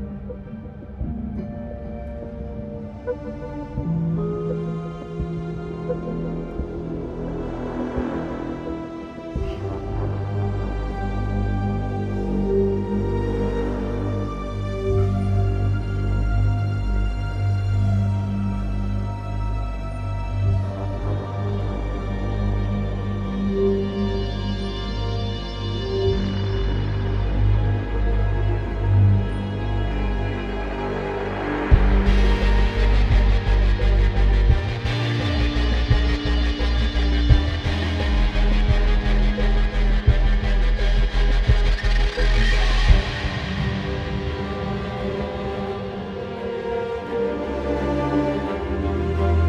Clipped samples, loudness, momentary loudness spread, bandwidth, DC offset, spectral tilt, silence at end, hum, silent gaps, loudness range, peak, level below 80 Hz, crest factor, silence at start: under 0.1%; -24 LUFS; 10 LU; 7.4 kHz; under 0.1%; -7.5 dB/octave; 0 s; none; none; 7 LU; 0 dBFS; -24 dBFS; 20 dB; 0 s